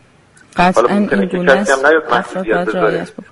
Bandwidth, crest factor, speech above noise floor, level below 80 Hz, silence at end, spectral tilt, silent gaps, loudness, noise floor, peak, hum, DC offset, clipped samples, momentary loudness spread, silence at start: 11.5 kHz; 14 dB; 34 dB; -44 dBFS; 0.1 s; -5.5 dB/octave; none; -14 LUFS; -47 dBFS; 0 dBFS; none; under 0.1%; under 0.1%; 6 LU; 0.55 s